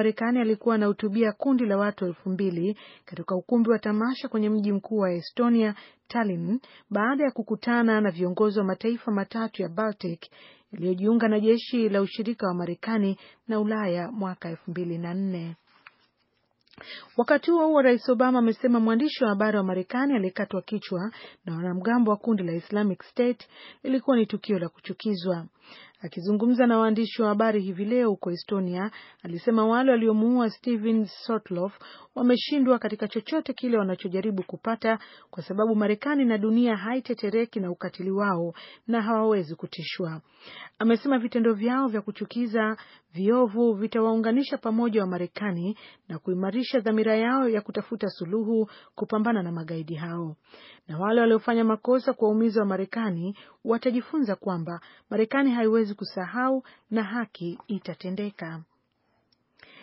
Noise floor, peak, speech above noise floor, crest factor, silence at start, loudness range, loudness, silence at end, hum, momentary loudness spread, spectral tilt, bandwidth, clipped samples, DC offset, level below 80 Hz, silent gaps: -72 dBFS; -6 dBFS; 46 dB; 18 dB; 0 s; 4 LU; -26 LUFS; 1.2 s; none; 12 LU; -5.5 dB/octave; 5.8 kHz; under 0.1%; under 0.1%; -78 dBFS; none